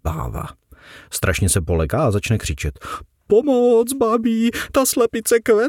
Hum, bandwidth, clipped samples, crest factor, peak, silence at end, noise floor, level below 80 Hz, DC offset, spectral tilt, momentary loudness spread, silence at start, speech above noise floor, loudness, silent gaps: none; 18 kHz; under 0.1%; 14 dB; -4 dBFS; 0 s; -44 dBFS; -34 dBFS; under 0.1%; -5 dB/octave; 13 LU; 0.05 s; 26 dB; -18 LUFS; none